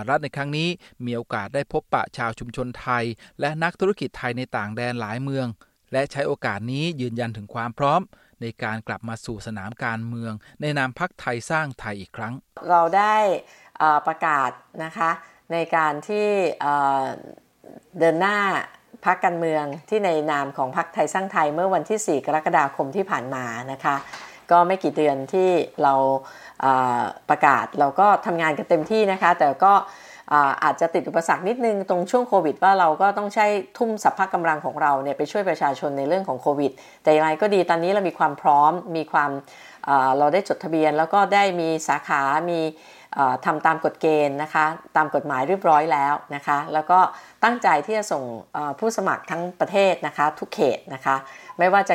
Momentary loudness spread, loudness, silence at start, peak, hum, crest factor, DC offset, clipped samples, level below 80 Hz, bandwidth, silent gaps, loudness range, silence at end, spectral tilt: 12 LU; -22 LUFS; 0 s; -2 dBFS; none; 20 dB; under 0.1%; under 0.1%; -60 dBFS; 16 kHz; none; 7 LU; 0 s; -5.5 dB/octave